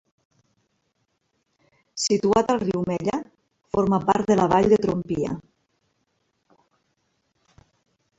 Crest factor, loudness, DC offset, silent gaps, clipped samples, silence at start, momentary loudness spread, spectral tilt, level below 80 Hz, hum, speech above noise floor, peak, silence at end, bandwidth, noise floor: 22 dB; -22 LUFS; under 0.1%; none; under 0.1%; 1.95 s; 11 LU; -5.5 dB/octave; -54 dBFS; none; 52 dB; -4 dBFS; 2.8 s; 8 kHz; -73 dBFS